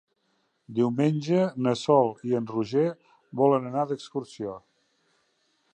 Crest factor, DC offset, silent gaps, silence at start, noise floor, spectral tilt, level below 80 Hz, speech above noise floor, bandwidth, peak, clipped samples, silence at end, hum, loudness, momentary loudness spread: 20 dB; under 0.1%; none; 0.7 s; -72 dBFS; -7.5 dB/octave; -72 dBFS; 47 dB; 9.4 kHz; -8 dBFS; under 0.1%; 1.2 s; none; -26 LUFS; 14 LU